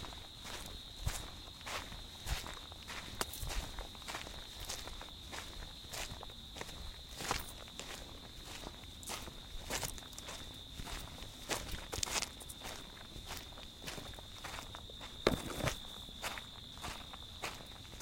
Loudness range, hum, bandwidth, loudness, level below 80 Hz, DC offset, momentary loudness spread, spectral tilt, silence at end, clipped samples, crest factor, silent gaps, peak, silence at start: 3 LU; none; 16.5 kHz; -44 LUFS; -52 dBFS; under 0.1%; 9 LU; -2.5 dB/octave; 0 s; under 0.1%; 36 dB; none; -8 dBFS; 0 s